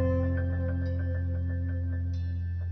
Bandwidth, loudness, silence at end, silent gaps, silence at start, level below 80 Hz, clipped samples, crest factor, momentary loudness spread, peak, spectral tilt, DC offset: 5.2 kHz; -31 LUFS; 0 s; none; 0 s; -34 dBFS; under 0.1%; 12 dB; 4 LU; -18 dBFS; -10.5 dB/octave; under 0.1%